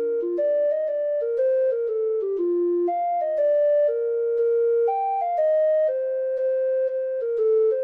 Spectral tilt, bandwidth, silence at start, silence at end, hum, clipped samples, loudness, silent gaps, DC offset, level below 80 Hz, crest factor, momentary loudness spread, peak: -6.5 dB/octave; 3.3 kHz; 0 s; 0 s; none; under 0.1%; -23 LUFS; none; under 0.1%; -76 dBFS; 8 dB; 4 LU; -14 dBFS